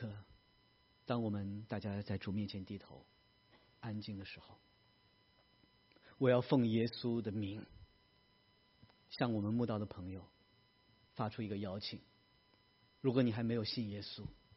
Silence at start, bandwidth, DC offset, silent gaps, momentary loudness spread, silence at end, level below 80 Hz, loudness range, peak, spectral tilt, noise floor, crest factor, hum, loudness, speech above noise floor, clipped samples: 0 s; 5.8 kHz; under 0.1%; none; 19 LU; 0.2 s; -72 dBFS; 9 LU; -18 dBFS; -6 dB/octave; -72 dBFS; 22 dB; none; -39 LUFS; 33 dB; under 0.1%